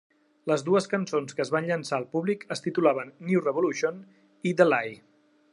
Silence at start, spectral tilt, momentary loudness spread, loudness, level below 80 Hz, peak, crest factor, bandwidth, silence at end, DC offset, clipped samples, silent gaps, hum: 0.45 s; -6 dB/octave; 9 LU; -27 LUFS; -80 dBFS; -6 dBFS; 22 dB; 11.5 kHz; 0.6 s; under 0.1%; under 0.1%; none; none